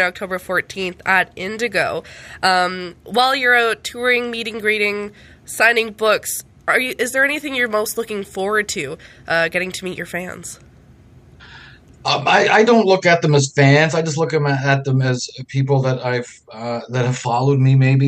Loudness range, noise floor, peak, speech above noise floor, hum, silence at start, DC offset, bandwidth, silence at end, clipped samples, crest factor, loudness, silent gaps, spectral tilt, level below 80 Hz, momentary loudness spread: 7 LU; -46 dBFS; 0 dBFS; 28 dB; none; 0 s; under 0.1%; 15.5 kHz; 0 s; under 0.1%; 18 dB; -17 LUFS; none; -5 dB/octave; -54 dBFS; 13 LU